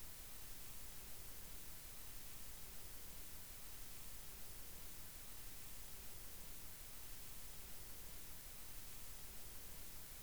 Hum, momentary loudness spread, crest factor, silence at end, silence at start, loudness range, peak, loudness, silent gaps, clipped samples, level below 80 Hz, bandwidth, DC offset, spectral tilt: none; 0 LU; 14 dB; 0 s; 0 s; 0 LU; -38 dBFS; -52 LUFS; none; under 0.1%; -60 dBFS; over 20 kHz; 0.2%; -2 dB/octave